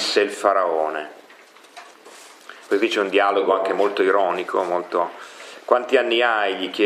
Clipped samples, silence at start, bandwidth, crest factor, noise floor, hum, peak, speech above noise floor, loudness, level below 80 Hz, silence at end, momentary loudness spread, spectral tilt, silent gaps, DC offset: under 0.1%; 0 s; 14 kHz; 20 dB; -48 dBFS; none; -2 dBFS; 28 dB; -20 LUFS; -82 dBFS; 0 s; 19 LU; -3 dB/octave; none; under 0.1%